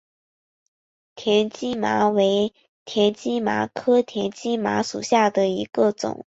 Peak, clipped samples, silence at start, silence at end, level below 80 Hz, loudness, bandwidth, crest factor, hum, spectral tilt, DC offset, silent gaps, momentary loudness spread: -6 dBFS; under 0.1%; 1.15 s; 0.2 s; -64 dBFS; -22 LUFS; 8 kHz; 18 dB; none; -4.5 dB/octave; under 0.1%; 2.69-2.86 s; 8 LU